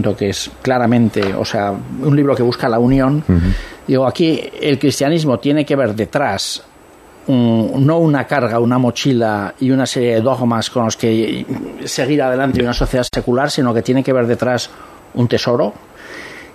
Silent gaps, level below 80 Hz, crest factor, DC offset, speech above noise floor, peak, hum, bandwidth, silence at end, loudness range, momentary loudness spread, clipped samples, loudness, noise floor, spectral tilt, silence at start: none; -34 dBFS; 14 dB; under 0.1%; 28 dB; 0 dBFS; none; 14 kHz; 0 s; 2 LU; 7 LU; under 0.1%; -15 LUFS; -42 dBFS; -6 dB/octave; 0 s